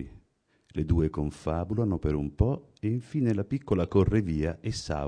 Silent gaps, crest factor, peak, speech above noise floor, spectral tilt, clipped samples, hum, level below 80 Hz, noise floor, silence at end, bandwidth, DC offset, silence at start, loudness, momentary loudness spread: none; 18 dB; -10 dBFS; 41 dB; -8 dB/octave; under 0.1%; none; -38 dBFS; -69 dBFS; 0 s; 10 kHz; under 0.1%; 0 s; -29 LUFS; 8 LU